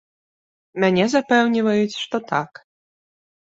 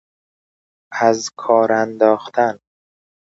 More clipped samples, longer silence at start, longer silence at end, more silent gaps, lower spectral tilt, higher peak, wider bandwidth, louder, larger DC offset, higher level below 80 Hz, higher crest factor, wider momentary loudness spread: neither; second, 0.75 s vs 0.9 s; first, 1.05 s vs 0.7 s; neither; about the same, -5.5 dB/octave vs -4.5 dB/octave; second, -4 dBFS vs 0 dBFS; about the same, 8 kHz vs 8 kHz; about the same, -19 LUFS vs -17 LUFS; neither; first, -64 dBFS vs -70 dBFS; about the same, 18 dB vs 18 dB; about the same, 9 LU vs 8 LU